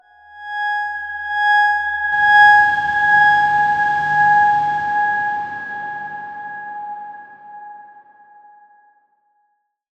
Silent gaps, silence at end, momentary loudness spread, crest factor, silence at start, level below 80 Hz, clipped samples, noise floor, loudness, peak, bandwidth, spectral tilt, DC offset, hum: none; 2.15 s; 19 LU; 16 dB; 0.35 s; -58 dBFS; under 0.1%; -67 dBFS; -15 LUFS; -2 dBFS; 8.8 kHz; -3 dB/octave; under 0.1%; none